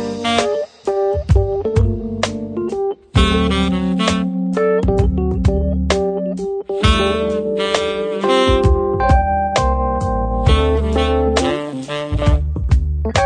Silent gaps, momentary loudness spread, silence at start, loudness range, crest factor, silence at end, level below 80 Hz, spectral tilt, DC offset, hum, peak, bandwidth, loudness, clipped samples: none; 7 LU; 0 s; 2 LU; 16 dB; 0 s; -22 dBFS; -6 dB/octave; under 0.1%; none; 0 dBFS; 10 kHz; -17 LUFS; under 0.1%